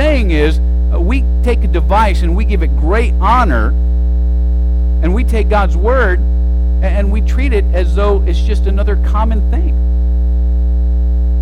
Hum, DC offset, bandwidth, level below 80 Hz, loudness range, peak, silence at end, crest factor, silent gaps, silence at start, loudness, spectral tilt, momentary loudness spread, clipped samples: 60 Hz at -10 dBFS; under 0.1%; 5.2 kHz; -12 dBFS; 1 LU; -2 dBFS; 0 s; 10 dB; none; 0 s; -14 LUFS; -8 dB/octave; 3 LU; under 0.1%